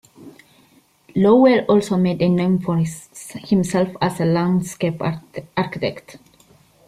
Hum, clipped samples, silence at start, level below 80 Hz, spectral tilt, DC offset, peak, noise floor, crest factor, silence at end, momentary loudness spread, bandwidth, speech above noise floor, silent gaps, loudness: none; under 0.1%; 0.2 s; -56 dBFS; -7 dB/octave; under 0.1%; -4 dBFS; -55 dBFS; 16 dB; 0.7 s; 14 LU; 14 kHz; 37 dB; none; -19 LUFS